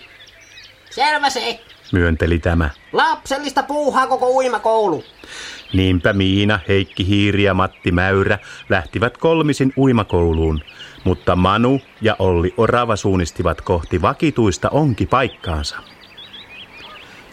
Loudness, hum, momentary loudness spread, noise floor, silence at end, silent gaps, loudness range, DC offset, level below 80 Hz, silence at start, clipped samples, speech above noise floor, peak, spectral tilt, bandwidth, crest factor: -17 LUFS; none; 16 LU; -43 dBFS; 0.1 s; none; 2 LU; under 0.1%; -34 dBFS; 0.05 s; under 0.1%; 27 dB; -2 dBFS; -6 dB/octave; 13.5 kHz; 16 dB